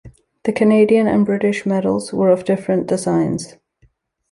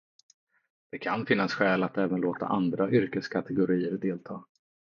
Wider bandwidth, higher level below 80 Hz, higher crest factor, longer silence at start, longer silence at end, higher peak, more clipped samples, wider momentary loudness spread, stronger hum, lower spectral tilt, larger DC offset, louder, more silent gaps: first, 11.5 kHz vs 7 kHz; first, -54 dBFS vs -70 dBFS; second, 14 dB vs 20 dB; second, 0.05 s vs 0.95 s; first, 0.8 s vs 0.45 s; first, -2 dBFS vs -8 dBFS; neither; about the same, 10 LU vs 11 LU; neither; about the same, -6.5 dB/octave vs -7.5 dB/octave; neither; first, -17 LUFS vs -28 LUFS; neither